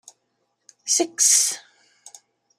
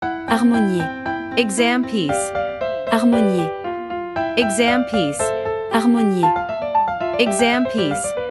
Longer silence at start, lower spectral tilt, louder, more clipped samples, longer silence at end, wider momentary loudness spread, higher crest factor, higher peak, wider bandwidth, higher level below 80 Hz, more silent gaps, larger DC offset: first, 0.85 s vs 0 s; second, 2 dB/octave vs -4.5 dB/octave; about the same, -18 LUFS vs -19 LUFS; neither; first, 1 s vs 0 s; first, 19 LU vs 8 LU; first, 24 dB vs 18 dB; about the same, -2 dBFS vs -2 dBFS; first, 15 kHz vs 12 kHz; second, -88 dBFS vs -50 dBFS; neither; neither